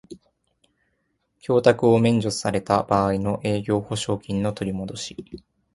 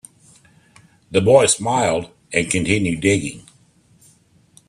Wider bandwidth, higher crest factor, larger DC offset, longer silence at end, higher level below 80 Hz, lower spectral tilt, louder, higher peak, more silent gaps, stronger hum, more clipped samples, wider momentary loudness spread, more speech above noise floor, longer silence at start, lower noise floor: second, 11.5 kHz vs 13 kHz; about the same, 20 dB vs 20 dB; neither; second, 0.35 s vs 1.3 s; about the same, -50 dBFS vs -52 dBFS; first, -6 dB/octave vs -4 dB/octave; second, -22 LUFS vs -18 LUFS; second, -4 dBFS vs 0 dBFS; neither; neither; neither; first, 16 LU vs 9 LU; first, 50 dB vs 38 dB; second, 0.1 s vs 1.1 s; first, -72 dBFS vs -55 dBFS